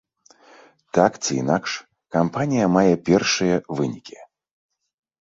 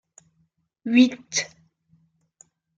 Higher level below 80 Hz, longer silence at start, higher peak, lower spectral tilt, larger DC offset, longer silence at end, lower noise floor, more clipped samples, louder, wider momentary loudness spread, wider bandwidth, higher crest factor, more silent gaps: first, -56 dBFS vs -76 dBFS; about the same, 0.95 s vs 0.85 s; about the same, -2 dBFS vs -4 dBFS; first, -5 dB/octave vs -2.5 dB/octave; neither; second, 0.95 s vs 1.3 s; second, -53 dBFS vs -69 dBFS; neither; about the same, -21 LUFS vs -21 LUFS; second, 10 LU vs 18 LU; about the same, 8 kHz vs 7.8 kHz; about the same, 20 dB vs 22 dB; neither